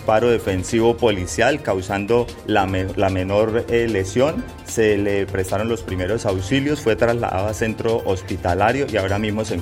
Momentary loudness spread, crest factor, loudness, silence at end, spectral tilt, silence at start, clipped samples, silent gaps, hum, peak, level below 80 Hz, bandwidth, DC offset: 5 LU; 16 dB; -20 LUFS; 0 s; -5.5 dB/octave; 0 s; under 0.1%; none; none; -4 dBFS; -42 dBFS; 16 kHz; under 0.1%